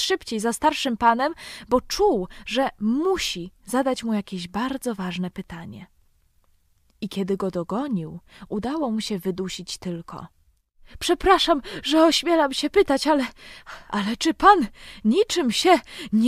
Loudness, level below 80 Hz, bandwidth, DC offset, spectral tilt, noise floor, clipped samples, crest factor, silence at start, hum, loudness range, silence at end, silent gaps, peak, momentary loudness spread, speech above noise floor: -23 LUFS; -48 dBFS; 15.5 kHz; under 0.1%; -4 dB/octave; -62 dBFS; under 0.1%; 20 dB; 0 s; none; 10 LU; 0 s; none; -2 dBFS; 15 LU; 39 dB